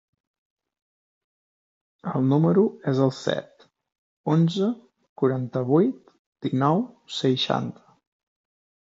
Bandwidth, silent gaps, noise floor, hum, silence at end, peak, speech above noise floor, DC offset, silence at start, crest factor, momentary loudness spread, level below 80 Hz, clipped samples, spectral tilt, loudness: 7.8 kHz; 3.98-4.24 s, 5.09-5.16 s, 6.19-6.32 s; under -90 dBFS; none; 1.1 s; -6 dBFS; over 67 dB; under 0.1%; 2.05 s; 18 dB; 13 LU; -70 dBFS; under 0.1%; -7.5 dB/octave; -24 LUFS